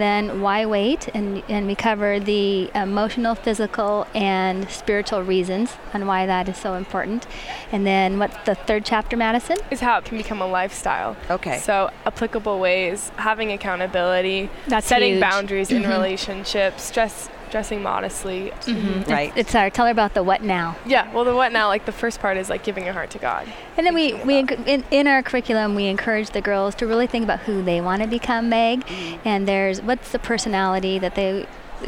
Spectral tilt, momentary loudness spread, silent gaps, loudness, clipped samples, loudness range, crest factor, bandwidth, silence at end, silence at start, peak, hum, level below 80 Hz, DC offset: -4.5 dB/octave; 8 LU; none; -21 LUFS; under 0.1%; 3 LU; 16 dB; 17 kHz; 0 s; 0 s; -6 dBFS; none; -40 dBFS; under 0.1%